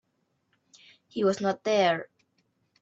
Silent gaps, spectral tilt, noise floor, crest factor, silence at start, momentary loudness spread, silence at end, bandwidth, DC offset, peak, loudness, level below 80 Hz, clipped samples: none; -5 dB/octave; -75 dBFS; 18 dB; 1.15 s; 14 LU; 0.75 s; 8 kHz; under 0.1%; -12 dBFS; -27 LUFS; -76 dBFS; under 0.1%